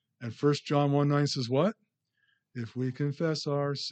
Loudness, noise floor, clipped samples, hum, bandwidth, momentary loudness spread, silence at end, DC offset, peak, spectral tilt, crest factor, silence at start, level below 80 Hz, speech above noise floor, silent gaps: -29 LUFS; -75 dBFS; under 0.1%; none; 8.6 kHz; 13 LU; 0 s; under 0.1%; -14 dBFS; -6.5 dB/octave; 16 dB; 0.2 s; -78 dBFS; 46 dB; none